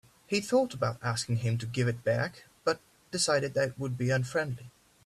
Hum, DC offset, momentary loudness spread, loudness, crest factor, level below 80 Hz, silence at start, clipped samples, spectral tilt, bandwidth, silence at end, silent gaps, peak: none; under 0.1%; 8 LU; -31 LUFS; 16 dB; -64 dBFS; 0.3 s; under 0.1%; -5 dB/octave; 14 kHz; 0.35 s; none; -14 dBFS